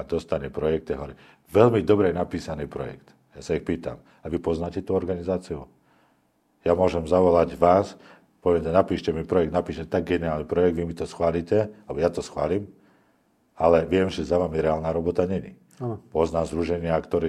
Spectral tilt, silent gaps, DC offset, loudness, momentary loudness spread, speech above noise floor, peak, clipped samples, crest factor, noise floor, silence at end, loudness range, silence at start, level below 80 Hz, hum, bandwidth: -7.5 dB/octave; none; under 0.1%; -24 LUFS; 13 LU; 42 dB; -2 dBFS; under 0.1%; 22 dB; -66 dBFS; 0 s; 7 LU; 0 s; -48 dBFS; none; 12 kHz